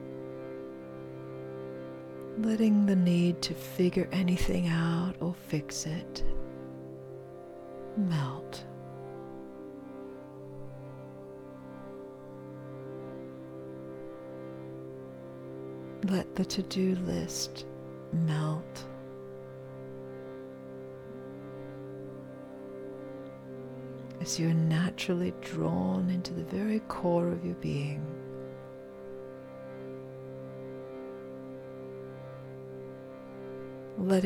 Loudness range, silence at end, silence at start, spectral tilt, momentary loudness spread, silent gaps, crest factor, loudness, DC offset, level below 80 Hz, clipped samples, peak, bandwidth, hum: 15 LU; 0 s; 0 s; -6 dB/octave; 16 LU; none; 20 dB; -35 LUFS; under 0.1%; -50 dBFS; under 0.1%; -14 dBFS; 16.5 kHz; none